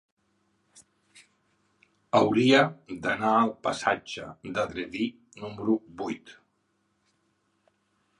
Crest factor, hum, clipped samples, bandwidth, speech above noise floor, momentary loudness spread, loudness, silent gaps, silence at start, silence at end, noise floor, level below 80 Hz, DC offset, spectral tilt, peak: 24 dB; none; under 0.1%; 11.5 kHz; 47 dB; 17 LU; -27 LUFS; none; 2.15 s; 1.85 s; -73 dBFS; -66 dBFS; under 0.1%; -5 dB/octave; -6 dBFS